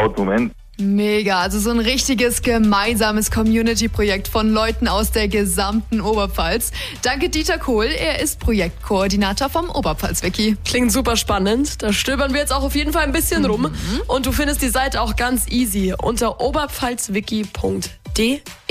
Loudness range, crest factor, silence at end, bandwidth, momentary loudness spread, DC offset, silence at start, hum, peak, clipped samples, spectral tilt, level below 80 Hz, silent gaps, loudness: 2 LU; 12 dB; 0.15 s; 15.5 kHz; 5 LU; under 0.1%; 0 s; none; -6 dBFS; under 0.1%; -4 dB/octave; -28 dBFS; none; -19 LUFS